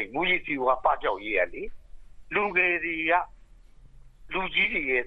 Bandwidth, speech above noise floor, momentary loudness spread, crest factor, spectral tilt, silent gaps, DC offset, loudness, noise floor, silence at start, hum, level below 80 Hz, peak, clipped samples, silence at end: 6 kHz; 25 dB; 10 LU; 18 dB; -6 dB/octave; none; under 0.1%; -25 LUFS; -51 dBFS; 0 s; none; -50 dBFS; -10 dBFS; under 0.1%; 0 s